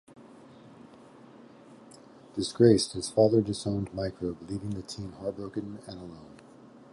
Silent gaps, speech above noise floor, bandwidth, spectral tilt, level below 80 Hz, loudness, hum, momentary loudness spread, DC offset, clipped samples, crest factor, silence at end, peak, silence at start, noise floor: none; 24 dB; 11.5 kHz; -6 dB/octave; -56 dBFS; -28 LUFS; none; 21 LU; under 0.1%; under 0.1%; 22 dB; 0.6 s; -8 dBFS; 0.2 s; -52 dBFS